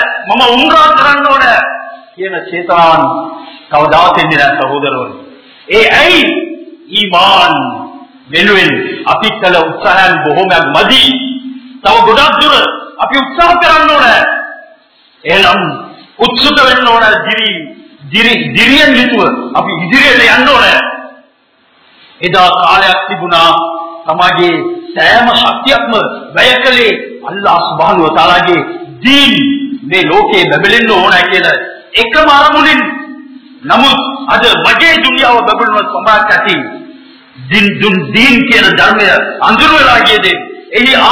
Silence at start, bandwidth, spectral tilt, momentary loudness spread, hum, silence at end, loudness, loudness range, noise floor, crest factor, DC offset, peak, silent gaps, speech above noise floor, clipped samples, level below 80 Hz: 0 s; 6 kHz; -4 dB/octave; 12 LU; none; 0 s; -6 LUFS; 3 LU; -49 dBFS; 8 dB; 0.5%; 0 dBFS; none; 42 dB; 4%; -38 dBFS